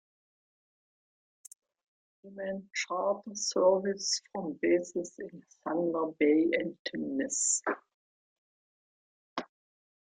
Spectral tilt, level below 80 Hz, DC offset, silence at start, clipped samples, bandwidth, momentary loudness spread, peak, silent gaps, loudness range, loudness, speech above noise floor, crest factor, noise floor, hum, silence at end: -3 dB/octave; -78 dBFS; under 0.1%; 2.25 s; under 0.1%; 11.5 kHz; 15 LU; -14 dBFS; 6.79-6.85 s, 7.94-9.36 s; 5 LU; -31 LUFS; over 59 dB; 20 dB; under -90 dBFS; none; 0.65 s